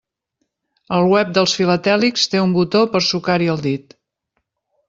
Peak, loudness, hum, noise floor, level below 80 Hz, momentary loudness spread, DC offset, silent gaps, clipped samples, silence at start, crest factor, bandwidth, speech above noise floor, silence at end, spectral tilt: -2 dBFS; -16 LUFS; none; -73 dBFS; -58 dBFS; 7 LU; under 0.1%; none; under 0.1%; 0.9 s; 16 dB; 7.6 kHz; 57 dB; 1.1 s; -5 dB/octave